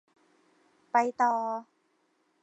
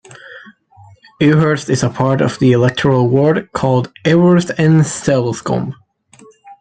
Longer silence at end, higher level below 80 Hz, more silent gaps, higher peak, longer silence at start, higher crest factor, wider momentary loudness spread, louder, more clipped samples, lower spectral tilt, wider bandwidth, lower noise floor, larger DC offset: first, 0.8 s vs 0.1 s; second, -90 dBFS vs -48 dBFS; neither; second, -12 dBFS vs 0 dBFS; first, 0.95 s vs 0.1 s; first, 22 dB vs 14 dB; first, 10 LU vs 7 LU; second, -29 LUFS vs -14 LUFS; neither; second, -4 dB/octave vs -6.5 dB/octave; second, 8.2 kHz vs 9.4 kHz; first, -72 dBFS vs -45 dBFS; neither